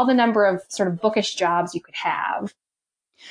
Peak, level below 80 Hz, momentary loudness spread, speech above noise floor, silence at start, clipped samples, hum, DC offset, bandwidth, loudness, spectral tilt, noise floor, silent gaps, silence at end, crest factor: -6 dBFS; -70 dBFS; 10 LU; 67 dB; 0 s; under 0.1%; none; under 0.1%; 10.5 kHz; -22 LUFS; -4.5 dB/octave; -89 dBFS; none; 0 s; 16 dB